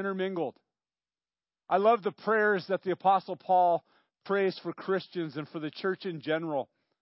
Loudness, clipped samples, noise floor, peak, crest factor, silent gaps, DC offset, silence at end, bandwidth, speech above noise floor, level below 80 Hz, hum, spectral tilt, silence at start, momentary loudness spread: -30 LUFS; under 0.1%; under -90 dBFS; -12 dBFS; 18 dB; none; under 0.1%; 0.35 s; 5.8 kHz; over 61 dB; -88 dBFS; none; -9.5 dB/octave; 0 s; 11 LU